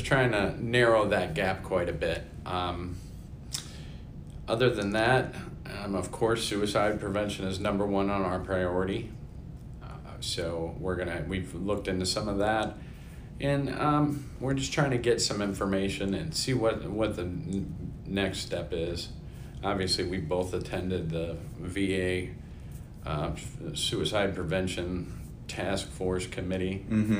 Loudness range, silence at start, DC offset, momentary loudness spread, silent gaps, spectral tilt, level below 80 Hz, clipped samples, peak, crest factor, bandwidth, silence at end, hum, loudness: 4 LU; 0 s; under 0.1%; 16 LU; none; -5 dB/octave; -46 dBFS; under 0.1%; -10 dBFS; 20 dB; 16 kHz; 0 s; none; -30 LUFS